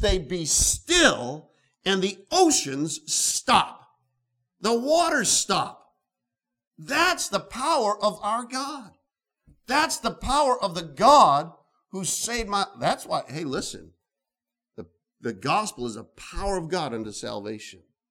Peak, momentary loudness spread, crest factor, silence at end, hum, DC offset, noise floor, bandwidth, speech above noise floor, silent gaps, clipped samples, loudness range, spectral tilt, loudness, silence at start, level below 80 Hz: -2 dBFS; 15 LU; 22 dB; 0.35 s; none; under 0.1%; -89 dBFS; 19 kHz; 65 dB; 6.67-6.71 s; under 0.1%; 9 LU; -2.5 dB/octave; -23 LUFS; 0 s; -44 dBFS